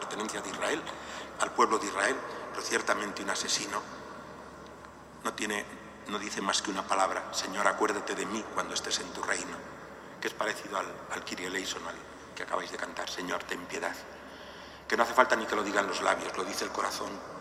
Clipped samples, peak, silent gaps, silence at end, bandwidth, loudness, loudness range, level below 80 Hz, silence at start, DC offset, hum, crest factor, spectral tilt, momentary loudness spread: under 0.1%; -6 dBFS; none; 0 s; 16 kHz; -32 LUFS; 6 LU; -64 dBFS; 0 s; under 0.1%; none; 28 dB; -2 dB/octave; 17 LU